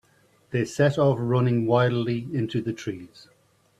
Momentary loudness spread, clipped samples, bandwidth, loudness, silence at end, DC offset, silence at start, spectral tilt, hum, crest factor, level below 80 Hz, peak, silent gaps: 11 LU; under 0.1%; 10.5 kHz; -24 LUFS; 0.75 s; under 0.1%; 0.5 s; -7.5 dB/octave; none; 18 dB; -60 dBFS; -8 dBFS; none